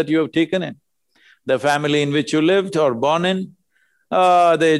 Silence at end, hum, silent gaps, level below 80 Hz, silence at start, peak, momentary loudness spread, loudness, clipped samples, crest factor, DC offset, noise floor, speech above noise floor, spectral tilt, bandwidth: 0 s; none; none; -64 dBFS; 0 s; -6 dBFS; 11 LU; -18 LUFS; under 0.1%; 14 dB; under 0.1%; -64 dBFS; 47 dB; -5.5 dB/octave; 12 kHz